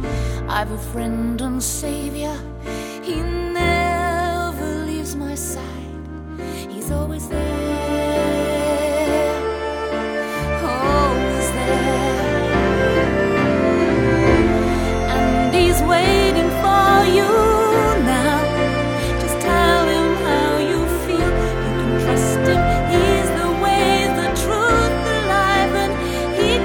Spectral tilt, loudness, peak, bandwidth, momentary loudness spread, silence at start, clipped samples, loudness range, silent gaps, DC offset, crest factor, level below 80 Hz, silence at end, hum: -5 dB/octave; -18 LUFS; -2 dBFS; 20 kHz; 10 LU; 0 s; under 0.1%; 8 LU; none; under 0.1%; 16 dB; -28 dBFS; 0 s; none